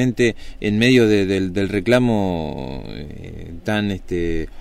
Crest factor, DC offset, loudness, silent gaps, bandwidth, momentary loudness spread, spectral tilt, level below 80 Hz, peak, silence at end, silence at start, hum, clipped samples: 16 dB; under 0.1%; -19 LUFS; none; 15 kHz; 19 LU; -6 dB/octave; -36 dBFS; -4 dBFS; 0 s; 0 s; none; under 0.1%